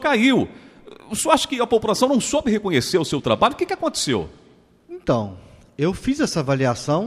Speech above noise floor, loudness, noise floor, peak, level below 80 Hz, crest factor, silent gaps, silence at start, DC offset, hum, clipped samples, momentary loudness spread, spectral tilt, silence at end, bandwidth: 28 dB; -20 LUFS; -48 dBFS; 0 dBFS; -48 dBFS; 20 dB; none; 0 s; under 0.1%; none; under 0.1%; 11 LU; -4.5 dB/octave; 0 s; 15.5 kHz